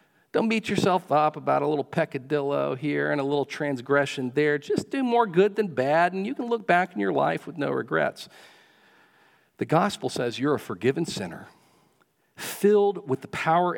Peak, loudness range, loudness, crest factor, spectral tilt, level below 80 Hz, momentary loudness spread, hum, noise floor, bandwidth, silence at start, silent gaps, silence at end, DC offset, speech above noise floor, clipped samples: -6 dBFS; 4 LU; -25 LUFS; 20 dB; -5.5 dB/octave; -72 dBFS; 8 LU; none; -66 dBFS; 18 kHz; 0.35 s; none; 0 s; under 0.1%; 42 dB; under 0.1%